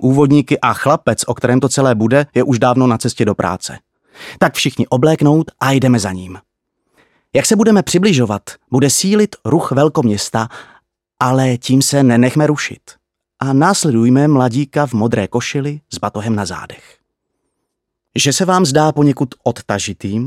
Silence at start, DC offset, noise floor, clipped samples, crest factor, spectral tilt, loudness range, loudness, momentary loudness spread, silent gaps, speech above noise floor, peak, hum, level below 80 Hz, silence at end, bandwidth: 0 s; under 0.1%; -75 dBFS; under 0.1%; 14 dB; -5 dB/octave; 4 LU; -14 LUFS; 11 LU; none; 61 dB; 0 dBFS; none; -52 dBFS; 0 s; 15.5 kHz